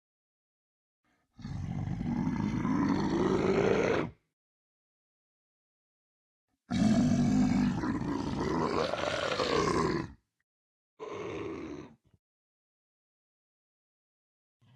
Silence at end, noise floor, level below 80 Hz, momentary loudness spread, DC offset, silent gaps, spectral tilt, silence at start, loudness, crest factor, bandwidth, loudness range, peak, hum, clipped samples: 2.85 s; under -90 dBFS; -52 dBFS; 15 LU; under 0.1%; 4.33-6.48 s, 10.43-10.97 s; -6.5 dB/octave; 1.4 s; -31 LUFS; 20 dB; 11.5 kHz; 16 LU; -12 dBFS; none; under 0.1%